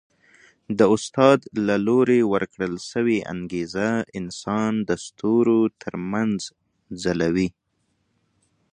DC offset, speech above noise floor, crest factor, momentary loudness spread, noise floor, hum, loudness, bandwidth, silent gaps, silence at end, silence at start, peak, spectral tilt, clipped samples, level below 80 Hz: under 0.1%; 49 dB; 22 dB; 12 LU; -71 dBFS; none; -22 LUFS; 10 kHz; none; 1.25 s; 0.7 s; -2 dBFS; -6 dB/octave; under 0.1%; -56 dBFS